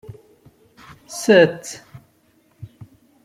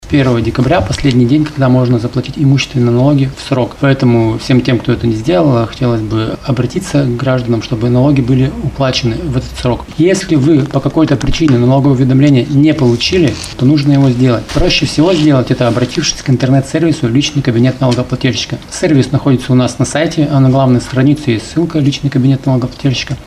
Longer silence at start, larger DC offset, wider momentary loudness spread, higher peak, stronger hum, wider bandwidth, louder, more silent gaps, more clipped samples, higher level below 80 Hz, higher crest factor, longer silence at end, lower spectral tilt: first, 1.1 s vs 0.05 s; neither; first, 27 LU vs 6 LU; about the same, -2 dBFS vs 0 dBFS; neither; first, 15.5 kHz vs 11.5 kHz; second, -16 LUFS vs -11 LUFS; neither; neither; second, -60 dBFS vs -30 dBFS; first, 20 dB vs 10 dB; first, 1.5 s vs 0 s; second, -4.5 dB/octave vs -6.5 dB/octave